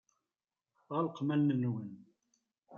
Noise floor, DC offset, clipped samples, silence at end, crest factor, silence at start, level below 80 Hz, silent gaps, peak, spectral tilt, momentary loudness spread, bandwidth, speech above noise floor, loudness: under -90 dBFS; under 0.1%; under 0.1%; 0 s; 16 dB; 0.9 s; -84 dBFS; none; -22 dBFS; -9.5 dB/octave; 11 LU; 6.8 kHz; over 57 dB; -34 LUFS